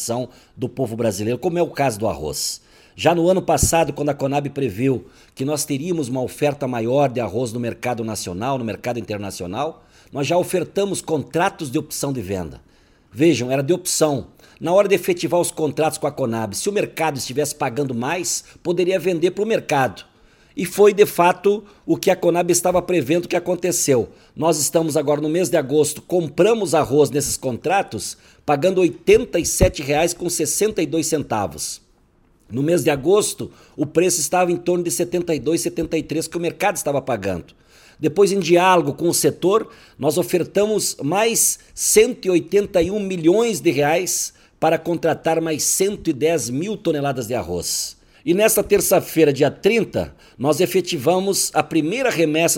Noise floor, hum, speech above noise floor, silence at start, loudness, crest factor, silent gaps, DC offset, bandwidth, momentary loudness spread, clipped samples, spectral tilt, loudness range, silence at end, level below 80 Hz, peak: -57 dBFS; none; 37 dB; 0 s; -19 LUFS; 20 dB; none; under 0.1%; 17 kHz; 9 LU; under 0.1%; -4 dB/octave; 5 LU; 0 s; -44 dBFS; 0 dBFS